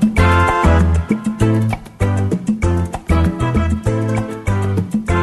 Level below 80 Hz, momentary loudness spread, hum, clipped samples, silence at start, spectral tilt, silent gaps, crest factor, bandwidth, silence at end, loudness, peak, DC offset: -24 dBFS; 7 LU; none; under 0.1%; 0 s; -7.5 dB/octave; none; 14 dB; 12.5 kHz; 0 s; -17 LUFS; 0 dBFS; under 0.1%